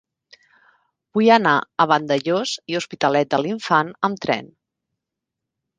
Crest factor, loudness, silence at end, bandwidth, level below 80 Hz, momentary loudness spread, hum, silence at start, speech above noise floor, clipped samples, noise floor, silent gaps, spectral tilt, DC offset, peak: 20 dB; -19 LUFS; 1.35 s; 9.6 kHz; -66 dBFS; 9 LU; none; 1.15 s; 64 dB; under 0.1%; -83 dBFS; none; -5 dB/octave; under 0.1%; -2 dBFS